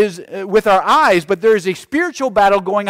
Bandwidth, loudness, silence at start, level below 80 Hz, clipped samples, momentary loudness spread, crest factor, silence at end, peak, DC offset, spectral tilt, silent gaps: 16 kHz; -14 LUFS; 0 s; -48 dBFS; under 0.1%; 7 LU; 10 dB; 0 s; -4 dBFS; under 0.1%; -4.5 dB/octave; none